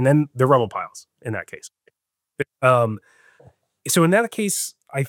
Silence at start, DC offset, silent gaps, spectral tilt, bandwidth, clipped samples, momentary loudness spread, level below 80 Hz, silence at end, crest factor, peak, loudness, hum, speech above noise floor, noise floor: 0 s; under 0.1%; none; -5 dB/octave; 17 kHz; under 0.1%; 18 LU; -72 dBFS; 0 s; 18 dB; -4 dBFS; -20 LUFS; none; 57 dB; -77 dBFS